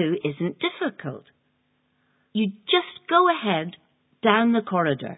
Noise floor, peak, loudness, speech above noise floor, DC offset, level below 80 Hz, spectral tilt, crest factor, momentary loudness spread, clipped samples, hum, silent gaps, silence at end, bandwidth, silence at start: -69 dBFS; -2 dBFS; -23 LUFS; 47 dB; under 0.1%; -72 dBFS; -10 dB/octave; 22 dB; 14 LU; under 0.1%; none; none; 0.05 s; 4 kHz; 0 s